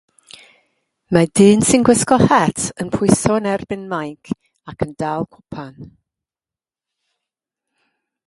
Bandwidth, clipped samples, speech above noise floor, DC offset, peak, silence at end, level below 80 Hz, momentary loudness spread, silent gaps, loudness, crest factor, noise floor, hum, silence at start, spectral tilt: 11.5 kHz; under 0.1%; over 74 dB; under 0.1%; 0 dBFS; 2.45 s; -46 dBFS; 17 LU; none; -16 LUFS; 18 dB; under -90 dBFS; none; 1.1 s; -5 dB/octave